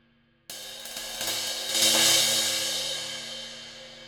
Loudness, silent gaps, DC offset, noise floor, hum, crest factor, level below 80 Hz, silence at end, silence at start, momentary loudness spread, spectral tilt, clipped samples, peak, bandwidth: -23 LUFS; none; under 0.1%; -54 dBFS; none; 20 dB; -64 dBFS; 0 s; 0.5 s; 20 LU; 0.5 dB/octave; under 0.1%; -8 dBFS; over 20 kHz